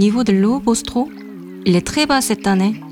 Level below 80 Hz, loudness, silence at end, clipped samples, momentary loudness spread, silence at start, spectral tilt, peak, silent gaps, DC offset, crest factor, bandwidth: -44 dBFS; -17 LUFS; 0 s; under 0.1%; 9 LU; 0 s; -5 dB/octave; -4 dBFS; none; under 0.1%; 14 dB; 16.5 kHz